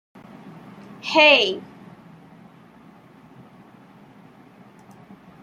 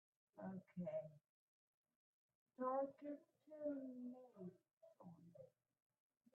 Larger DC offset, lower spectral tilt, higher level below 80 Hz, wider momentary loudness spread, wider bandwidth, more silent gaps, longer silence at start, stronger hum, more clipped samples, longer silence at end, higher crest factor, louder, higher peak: neither; second, -3 dB/octave vs -9 dB/octave; first, -72 dBFS vs under -90 dBFS; first, 30 LU vs 20 LU; first, 10 kHz vs 4 kHz; second, none vs 1.29-1.84 s, 1.96-2.29 s, 2.35-2.46 s, 4.73-4.81 s; about the same, 0.45 s vs 0.35 s; neither; neither; first, 3.8 s vs 0.85 s; about the same, 24 dB vs 20 dB; first, -15 LUFS vs -51 LUFS; first, -2 dBFS vs -34 dBFS